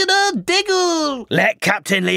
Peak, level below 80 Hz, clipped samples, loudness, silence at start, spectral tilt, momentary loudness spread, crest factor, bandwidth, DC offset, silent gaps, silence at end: 0 dBFS; -60 dBFS; under 0.1%; -17 LUFS; 0 s; -3 dB/octave; 4 LU; 16 dB; 16 kHz; under 0.1%; none; 0 s